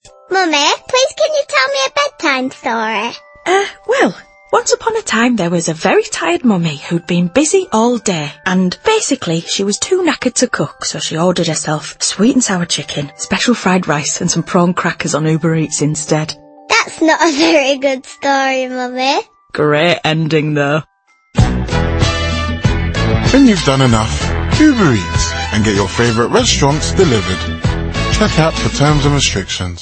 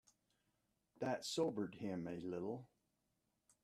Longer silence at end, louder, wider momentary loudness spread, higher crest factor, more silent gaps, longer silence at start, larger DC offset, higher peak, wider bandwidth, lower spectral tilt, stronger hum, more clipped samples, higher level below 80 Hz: second, 0 s vs 0.95 s; first, -14 LUFS vs -44 LUFS; about the same, 7 LU vs 7 LU; second, 14 dB vs 20 dB; neither; second, 0.05 s vs 1 s; neither; first, 0 dBFS vs -26 dBFS; second, 8.8 kHz vs 14 kHz; about the same, -4.5 dB/octave vs -5 dB/octave; neither; neither; first, -28 dBFS vs -82 dBFS